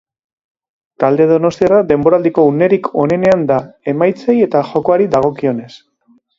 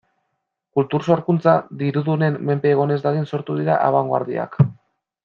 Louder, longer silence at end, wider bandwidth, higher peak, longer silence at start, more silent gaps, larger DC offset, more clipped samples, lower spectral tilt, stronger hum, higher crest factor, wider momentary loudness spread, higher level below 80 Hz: first, -13 LUFS vs -20 LUFS; about the same, 0.6 s vs 0.5 s; about the same, 7.6 kHz vs 7 kHz; about the same, 0 dBFS vs -2 dBFS; first, 1 s vs 0.75 s; neither; neither; neither; second, -8 dB/octave vs -9.5 dB/octave; neither; about the same, 14 dB vs 18 dB; about the same, 6 LU vs 6 LU; first, -50 dBFS vs -58 dBFS